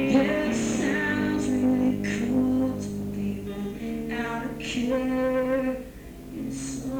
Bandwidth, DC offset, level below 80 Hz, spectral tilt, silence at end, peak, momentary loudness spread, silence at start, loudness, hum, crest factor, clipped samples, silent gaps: 19.5 kHz; under 0.1%; -46 dBFS; -5.5 dB/octave; 0 s; -10 dBFS; 10 LU; 0 s; -27 LUFS; none; 16 dB; under 0.1%; none